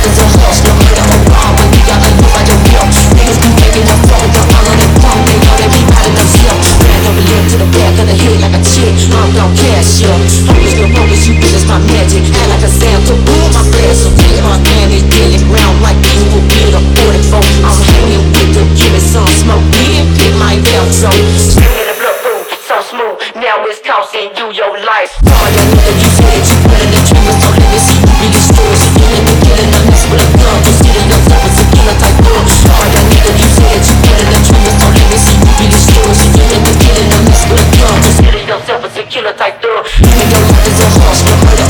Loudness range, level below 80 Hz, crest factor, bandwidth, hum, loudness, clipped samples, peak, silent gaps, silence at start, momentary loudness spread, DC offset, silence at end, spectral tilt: 3 LU; -10 dBFS; 6 dB; over 20 kHz; none; -6 LUFS; 5%; 0 dBFS; none; 0 s; 6 LU; under 0.1%; 0 s; -4.5 dB/octave